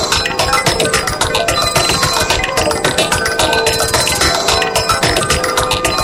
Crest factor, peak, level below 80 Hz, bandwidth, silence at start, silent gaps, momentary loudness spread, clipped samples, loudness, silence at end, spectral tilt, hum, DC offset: 14 dB; 0 dBFS; -30 dBFS; 17 kHz; 0 s; none; 2 LU; under 0.1%; -13 LUFS; 0 s; -2 dB/octave; none; under 0.1%